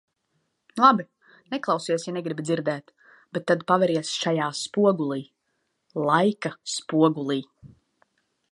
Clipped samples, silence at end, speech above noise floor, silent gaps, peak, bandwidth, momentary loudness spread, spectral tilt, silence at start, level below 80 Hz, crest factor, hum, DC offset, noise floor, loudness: under 0.1%; 0.85 s; 51 dB; none; -2 dBFS; 11.5 kHz; 14 LU; -5 dB/octave; 0.75 s; -74 dBFS; 22 dB; none; under 0.1%; -75 dBFS; -24 LUFS